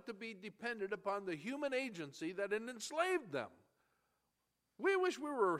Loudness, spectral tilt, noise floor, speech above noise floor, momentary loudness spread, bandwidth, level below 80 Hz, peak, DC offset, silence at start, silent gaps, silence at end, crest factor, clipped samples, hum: -40 LUFS; -4 dB/octave; -86 dBFS; 46 dB; 9 LU; 14 kHz; -88 dBFS; -22 dBFS; under 0.1%; 0.05 s; none; 0 s; 18 dB; under 0.1%; none